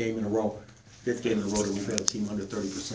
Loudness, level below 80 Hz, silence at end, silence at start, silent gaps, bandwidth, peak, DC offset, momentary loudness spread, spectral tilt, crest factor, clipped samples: -30 LUFS; -54 dBFS; 0 s; 0 s; none; 8 kHz; 0 dBFS; under 0.1%; 6 LU; -4 dB/octave; 30 dB; under 0.1%